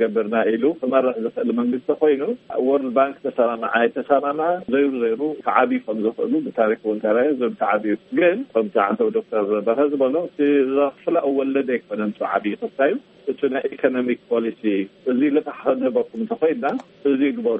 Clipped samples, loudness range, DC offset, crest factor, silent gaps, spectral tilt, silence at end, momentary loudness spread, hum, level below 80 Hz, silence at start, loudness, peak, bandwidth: under 0.1%; 2 LU; under 0.1%; 18 dB; none; -4.5 dB/octave; 0 s; 5 LU; none; -68 dBFS; 0 s; -21 LUFS; -2 dBFS; 4.2 kHz